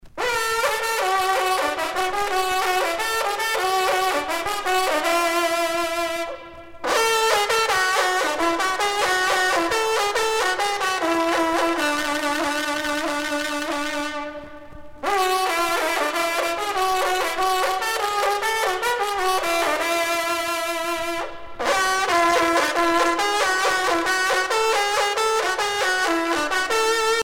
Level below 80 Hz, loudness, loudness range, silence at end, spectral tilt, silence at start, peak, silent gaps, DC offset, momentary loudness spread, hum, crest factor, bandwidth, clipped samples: -52 dBFS; -21 LUFS; 4 LU; 0 s; -1 dB/octave; 0.05 s; -6 dBFS; none; under 0.1%; 6 LU; none; 16 dB; 19 kHz; under 0.1%